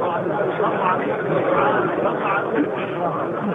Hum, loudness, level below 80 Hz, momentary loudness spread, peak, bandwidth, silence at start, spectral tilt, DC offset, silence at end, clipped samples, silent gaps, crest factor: none; -21 LUFS; -60 dBFS; 5 LU; -6 dBFS; 4.6 kHz; 0 s; -8.5 dB/octave; under 0.1%; 0 s; under 0.1%; none; 14 dB